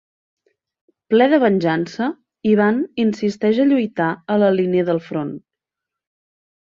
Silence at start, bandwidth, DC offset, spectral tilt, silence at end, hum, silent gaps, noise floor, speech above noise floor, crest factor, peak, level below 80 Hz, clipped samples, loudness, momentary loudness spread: 1.1 s; 7.2 kHz; under 0.1%; -7.5 dB/octave; 1.25 s; none; none; -85 dBFS; 68 dB; 16 dB; -2 dBFS; -64 dBFS; under 0.1%; -18 LUFS; 10 LU